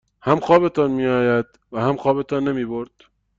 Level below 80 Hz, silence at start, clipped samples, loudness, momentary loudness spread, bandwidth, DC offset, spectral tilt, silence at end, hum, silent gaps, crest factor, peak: -54 dBFS; 0.25 s; under 0.1%; -20 LUFS; 13 LU; 7.6 kHz; under 0.1%; -8 dB/octave; 0.55 s; none; none; 18 dB; -2 dBFS